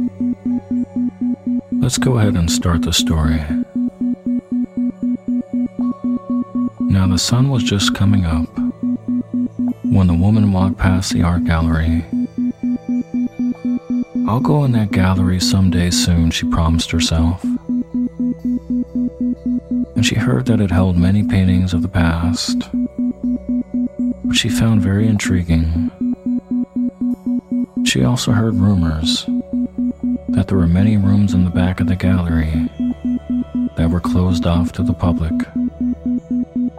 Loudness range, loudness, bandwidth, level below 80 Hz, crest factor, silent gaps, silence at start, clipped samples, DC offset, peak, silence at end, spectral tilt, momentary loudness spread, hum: 3 LU; -17 LUFS; 15 kHz; -30 dBFS; 16 dB; none; 0 s; under 0.1%; under 0.1%; 0 dBFS; 0 s; -6 dB/octave; 7 LU; none